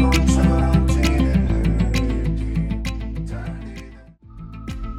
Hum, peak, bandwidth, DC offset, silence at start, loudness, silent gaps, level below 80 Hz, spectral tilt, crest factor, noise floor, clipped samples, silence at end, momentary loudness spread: none; -4 dBFS; 13 kHz; under 0.1%; 0 s; -20 LUFS; none; -22 dBFS; -6.5 dB/octave; 16 dB; -42 dBFS; under 0.1%; 0 s; 18 LU